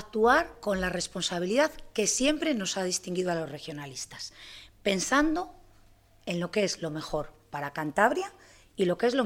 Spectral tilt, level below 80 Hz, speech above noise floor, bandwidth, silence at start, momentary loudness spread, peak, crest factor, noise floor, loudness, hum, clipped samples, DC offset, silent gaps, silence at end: -3.5 dB/octave; -52 dBFS; 30 dB; 16.5 kHz; 0 s; 14 LU; -8 dBFS; 22 dB; -59 dBFS; -29 LUFS; none; under 0.1%; under 0.1%; none; 0 s